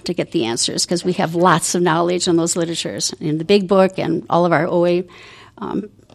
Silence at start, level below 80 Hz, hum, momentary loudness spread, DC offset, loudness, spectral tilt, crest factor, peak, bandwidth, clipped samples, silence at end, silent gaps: 0.05 s; -56 dBFS; none; 10 LU; under 0.1%; -17 LUFS; -4.5 dB/octave; 18 dB; 0 dBFS; 14.5 kHz; under 0.1%; 0.25 s; none